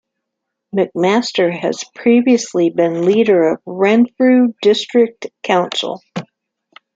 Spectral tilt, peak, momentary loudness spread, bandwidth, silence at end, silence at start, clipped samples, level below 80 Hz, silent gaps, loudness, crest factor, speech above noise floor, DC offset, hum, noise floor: -5 dB/octave; -2 dBFS; 10 LU; 7.8 kHz; 0.7 s; 0.75 s; under 0.1%; -64 dBFS; none; -15 LUFS; 14 dB; 63 dB; under 0.1%; none; -77 dBFS